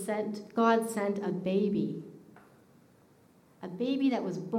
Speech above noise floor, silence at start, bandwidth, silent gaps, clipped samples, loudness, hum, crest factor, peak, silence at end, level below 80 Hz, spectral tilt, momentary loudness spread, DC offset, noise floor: 32 dB; 0 s; 15.5 kHz; none; under 0.1%; -30 LUFS; none; 20 dB; -12 dBFS; 0 s; -76 dBFS; -6.5 dB/octave; 17 LU; under 0.1%; -62 dBFS